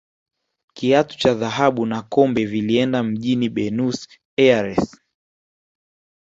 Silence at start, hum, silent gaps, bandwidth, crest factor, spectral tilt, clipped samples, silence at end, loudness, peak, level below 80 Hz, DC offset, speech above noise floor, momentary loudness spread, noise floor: 0.75 s; none; 4.25-4.37 s; 8 kHz; 20 dB; -6 dB/octave; under 0.1%; 1.35 s; -19 LUFS; -2 dBFS; -54 dBFS; under 0.1%; over 71 dB; 8 LU; under -90 dBFS